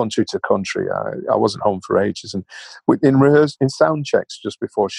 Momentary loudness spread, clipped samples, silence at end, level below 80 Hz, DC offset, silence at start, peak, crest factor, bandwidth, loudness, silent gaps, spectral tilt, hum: 14 LU; under 0.1%; 0 s; -58 dBFS; under 0.1%; 0 s; -2 dBFS; 16 dB; 11 kHz; -18 LUFS; none; -6 dB/octave; none